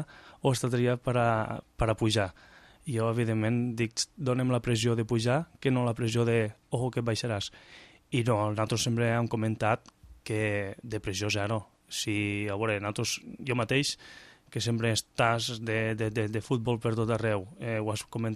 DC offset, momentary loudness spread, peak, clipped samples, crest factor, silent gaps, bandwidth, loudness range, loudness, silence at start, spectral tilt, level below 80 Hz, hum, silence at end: under 0.1%; 7 LU; -10 dBFS; under 0.1%; 20 dB; none; 14 kHz; 3 LU; -30 LUFS; 0 s; -5 dB/octave; -54 dBFS; none; 0 s